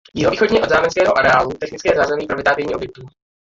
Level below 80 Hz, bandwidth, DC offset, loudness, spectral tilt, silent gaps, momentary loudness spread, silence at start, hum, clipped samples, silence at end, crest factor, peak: -44 dBFS; 7.8 kHz; under 0.1%; -16 LUFS; -4.5 dB/octave; none; 10 LU; 0.15 s; none; under 0.1%; 0.5 s; 16 dB; -2 dBFS